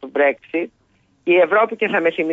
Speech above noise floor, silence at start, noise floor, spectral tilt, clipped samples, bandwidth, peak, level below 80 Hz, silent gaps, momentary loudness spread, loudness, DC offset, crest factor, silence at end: 42 dB; 0 s; -59 dBFS; -6.5 dB/octave; under 0.1%; 4 kHz; -6 dBFS; -70 dBFS; none; 12 LU; -18 LUFS; under 0.1%; 14 dB; 0 s